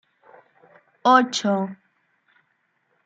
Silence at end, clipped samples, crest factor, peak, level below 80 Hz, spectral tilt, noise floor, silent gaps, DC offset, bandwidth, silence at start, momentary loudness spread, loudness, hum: 1.3 s; under 0.1%; 22 dB; -2 dBFS; -82 dBFS; -4 dB/octave; -70 dBFS; none; under 0.1%; 9 kHz; 1.05 s; 10 LU; -20 LUFS; none